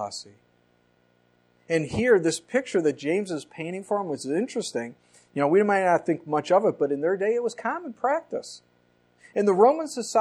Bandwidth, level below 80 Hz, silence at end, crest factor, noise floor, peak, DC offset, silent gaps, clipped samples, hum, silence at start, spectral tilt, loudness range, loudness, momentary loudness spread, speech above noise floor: 12.5 kHz; -64 dBFS; 0 s; 20 dB; -65 dBFS; -6 dBFS; under 0.1%; none; under 0.1%; 60 Hz at -60 dBFS; 0 s; -5 dB/octave; 3 LU; -25 LUFS; 14 LU; 40 dB